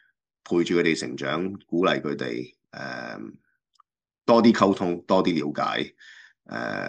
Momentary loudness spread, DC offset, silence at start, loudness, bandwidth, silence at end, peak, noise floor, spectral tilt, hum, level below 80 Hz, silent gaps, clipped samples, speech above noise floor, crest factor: 18 LU; under 0.1%; 0.5 s; -24 LUFS; 9.2 kHz; 0 s; -4 dBFS; -66 dBFS; -5.5 dB/octave; none; -68 dBFS; none; under 0.1%; 42 dB; 20 dB